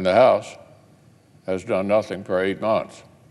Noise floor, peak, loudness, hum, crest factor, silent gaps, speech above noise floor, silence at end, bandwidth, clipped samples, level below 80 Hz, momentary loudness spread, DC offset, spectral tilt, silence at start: -53 dBFS; -4 dBFS; -21 LUFS; none; 18 dB; none; 33 dB; 0.3 s; 11.5 kHz; under 0.1%; -64 dBFS; 20 LU; under 0.1%; -6 dB/octave; 0 s